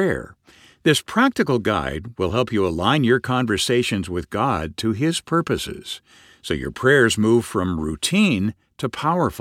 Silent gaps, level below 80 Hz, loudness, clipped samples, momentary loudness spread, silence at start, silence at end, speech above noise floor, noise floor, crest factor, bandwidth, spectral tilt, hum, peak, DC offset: none; -44 dBFS; -21 LUFS; under 0.1%; 11 LU; 0 s; 0 s; 25 dB; -46 dBFS; 18 dB; 16 kHz; -5 dB/octave; none; -2 dBFS; under 0.1%